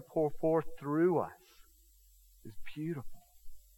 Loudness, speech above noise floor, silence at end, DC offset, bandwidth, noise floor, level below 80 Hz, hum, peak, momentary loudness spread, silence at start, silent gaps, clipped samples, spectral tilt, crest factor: -34 LUFS; 30 dB; 0.15 s; under 0.1%; 17.5 kHz; -63 dBFS; -58 dBFS; none; -18 dBFS; 22 LU; 0 s; none; under 0.1%; -8.5 dB/octave; 18 dB